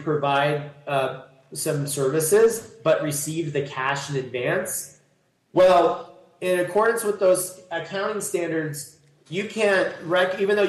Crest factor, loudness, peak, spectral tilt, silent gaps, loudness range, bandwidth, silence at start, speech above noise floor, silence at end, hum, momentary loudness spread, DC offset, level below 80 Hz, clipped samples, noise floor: 14 dB; -23 LUFS; -8 dBFS; -4 dB/octave; none; 3 LU; 12.5 kHz; 0 s; 43 dB; 0 s; none; 12 LU; under 0.1%; -64 dBFS; under 0.1%; -65 dBFS